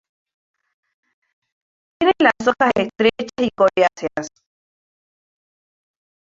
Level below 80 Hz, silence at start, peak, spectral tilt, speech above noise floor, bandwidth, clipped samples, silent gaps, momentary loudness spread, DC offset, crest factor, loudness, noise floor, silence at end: -58 dBFS; 2 s; -2 dBFS; -4.5 dB/octave; over 72 dB; 7.8 kHz; under 0.1%; none; 11 LU; under 0.1%; 20 dB; -18 LUFS; under -90 dBFS; 2 s